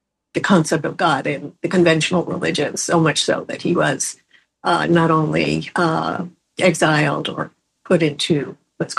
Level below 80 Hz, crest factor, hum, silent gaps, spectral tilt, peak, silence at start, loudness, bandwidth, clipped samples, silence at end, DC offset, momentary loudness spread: -56 dBFS; 18 dB; none; none; -4.5 dB/octave; -2 dBFS; 0.35 s; -18 LUFS; 12.5 kHz; under 0.1%; 0 s; under 0.1%; 10 LU